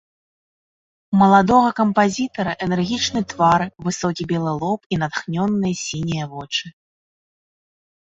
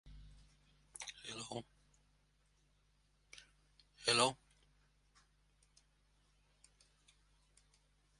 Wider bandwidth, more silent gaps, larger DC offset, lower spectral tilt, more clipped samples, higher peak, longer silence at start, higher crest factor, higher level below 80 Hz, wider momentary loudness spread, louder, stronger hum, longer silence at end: second, 8 kHz vs 11.5 kHz; first, 4.86-4.90 s vs none; neither; first, -5 dB/octave vs -2 dB/octave; neither; first, -2 dBFS vs -16 dBFS; first, 1.1 s vs 0.05 s; second, 18 dB vs 32 dB; first, -52 dBFS vs -70 dBFS; second, 11 LU vs 27 LU; first, -19 LUFS vs -38 LUFS; second, none vs 50 Hz at -75 dBFS; second, 1.4 s vs 3.85 s